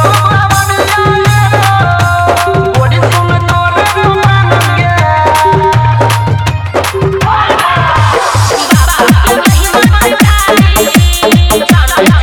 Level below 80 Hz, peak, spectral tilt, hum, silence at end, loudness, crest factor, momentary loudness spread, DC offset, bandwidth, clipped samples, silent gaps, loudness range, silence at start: -18 dBFS; 0 dBFS; -5 dB/octave; none; 0 s; -8 LUFS; 8 dB; 3 LU; under 0.1%; over 20 kHz; 1%; none; 2 LU; 0 s